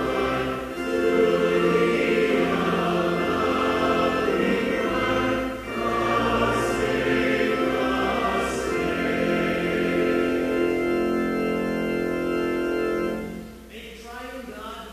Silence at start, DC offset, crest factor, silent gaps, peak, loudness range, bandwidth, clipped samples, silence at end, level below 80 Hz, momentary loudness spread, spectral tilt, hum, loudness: 0 s; under 0.1%; 14 dB; none; -10 dBFS; 4 LU; 15 kHz; under 0.1%; 0 s; -46 dBFS; 10 LU; -5.5 dB/octave; none; -23 LUFS